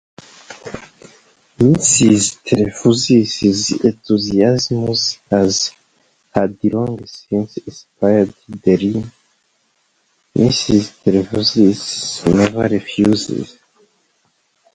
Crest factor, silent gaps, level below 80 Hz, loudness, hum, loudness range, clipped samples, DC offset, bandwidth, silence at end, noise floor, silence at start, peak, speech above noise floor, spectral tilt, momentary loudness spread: 16 dB; none; -46 dBFS; -15 LUFS; none; 5 LU; under 0.1%; under 0.1%; 10 kHz; 1.3 s; -62 dBFS; 0.5 s; 0 dBFS; 47 dB; -4.5 dB/octave; 14 LU